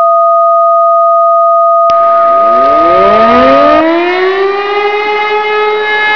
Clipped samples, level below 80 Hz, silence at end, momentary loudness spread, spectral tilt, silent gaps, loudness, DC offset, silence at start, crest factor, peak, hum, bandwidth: 1%; -42 dBFS; 0 s; 6 LU; -5.5 dB/octave; none; -7 LUFS; under 0.1%; 0 s; 6 dB; 0 dBFS; none; 5.4 kHz